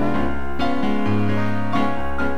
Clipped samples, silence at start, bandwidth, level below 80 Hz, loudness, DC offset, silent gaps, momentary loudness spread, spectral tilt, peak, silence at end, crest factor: under 0.1%; 0 s; 13.5 kHz; -36 dBFS; -23 LUFS; 10%; none; 4 LU; -7.5 dB/octave; -6 dBFS; 0 s; 14 dB